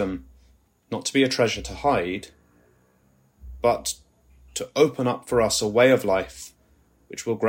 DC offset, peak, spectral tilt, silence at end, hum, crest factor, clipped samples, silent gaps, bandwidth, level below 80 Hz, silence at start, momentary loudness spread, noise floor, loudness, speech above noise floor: under 0.1%; -4 dBFS; -4 dB/octave; 0 s; none; 20 dB; under 0.1%; none; 16.5 kHz; -48 dBFS; 0 s; 18 LU; -62 dBFS; -23 LUFS; 39 dB